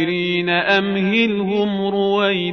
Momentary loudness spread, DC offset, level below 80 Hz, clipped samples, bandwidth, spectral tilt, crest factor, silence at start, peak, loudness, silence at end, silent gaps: 4 LU; 0.1%; -60 dBFS; under 0.1%; 6.4 kHz; -7 dB/octave; 14 dB; 0 s; -4 dBFS; -18 LUFS; 0 s; none